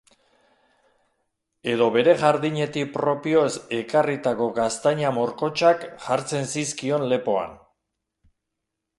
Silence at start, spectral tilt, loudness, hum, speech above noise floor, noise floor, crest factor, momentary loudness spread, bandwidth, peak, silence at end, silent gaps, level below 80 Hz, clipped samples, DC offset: 1.65 s; -5 dB/octave; -23 LUFS; none; 60 dB; -82 dBFS; 20 dB; 8 LU; 11.5 kHz; -4 dBFS; 1.45 s; none; -64 dBFS; under 0.1%; under 0.1%